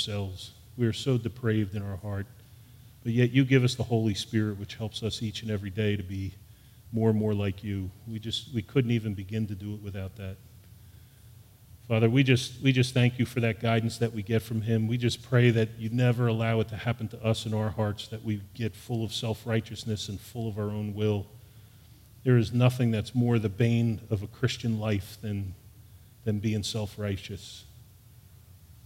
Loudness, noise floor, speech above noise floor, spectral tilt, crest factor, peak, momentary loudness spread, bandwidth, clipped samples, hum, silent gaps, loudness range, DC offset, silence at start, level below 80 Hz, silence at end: -29 LUFS; -54 dBFS; 26 dB; -6.5 dB/octave; 20 dB; -8 dBFS; 13 LU; 16 kHz; under 0.1%; none; none; 6 LU; under 0.1%; 0 s; -58 dBFS; 0.15 s